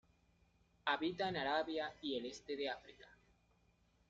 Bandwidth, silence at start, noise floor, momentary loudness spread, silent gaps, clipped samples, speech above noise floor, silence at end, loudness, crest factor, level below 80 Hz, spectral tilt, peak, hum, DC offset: 7.6 kHz; 0.85 s; -75 dBFS; 7 LU; none; under 0.1%; 34 dB; 0.95 s; -41 LUFS; 22 dB; -74 dBFS; -2 dB/octave; -22 dBFS; none; under 0.1%